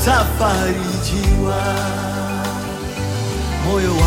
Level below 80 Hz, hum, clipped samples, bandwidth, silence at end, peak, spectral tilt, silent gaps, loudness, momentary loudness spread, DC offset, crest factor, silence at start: -24 dBFS; none; under 0.1%; 17 kHz; 0 s; -2 dBFS; -5 dB/octave; none; -19 LUFS; 7 LU; under 0.1%; 16 dB; 0 s